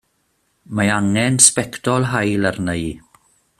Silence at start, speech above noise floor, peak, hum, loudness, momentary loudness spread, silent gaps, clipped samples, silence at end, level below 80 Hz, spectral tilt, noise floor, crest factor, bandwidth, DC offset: 0.7 s; 48 dB; 0 dBFS; none; -16 LUFS; 15 LU; none; under 0.1%; 0.6 s; -48 dBFS; -3.5 dB/octave; -66 dBFS; 20 dB; 15.5 kHz; under 0.1%